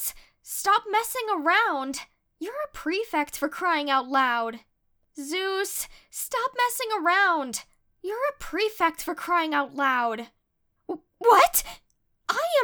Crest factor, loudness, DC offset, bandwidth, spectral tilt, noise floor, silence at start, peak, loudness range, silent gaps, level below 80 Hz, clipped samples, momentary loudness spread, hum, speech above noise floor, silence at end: 20 dB; -25 LUFS; under 0.1%; over 20 kHz; -0.5 dB/octave; -73 dBFS; 0 s; -6 dBFS; 3 LU; none; -58 dBFS; under 0.1%; 15 LU; none; 48 dB; 0 s